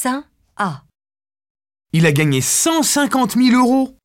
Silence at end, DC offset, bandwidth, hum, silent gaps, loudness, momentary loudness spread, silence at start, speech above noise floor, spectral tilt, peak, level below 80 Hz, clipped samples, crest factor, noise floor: 0.15 s; under 0.1%; 16.5 kHz; none; 1.50-1.55 s; -15 LUFS; 10 LU; 0 s; over 75 dB; -4 dB/octave; -2 dBFS; -56 dBFS; under 0.1%; 14 dB; under -90 dBFS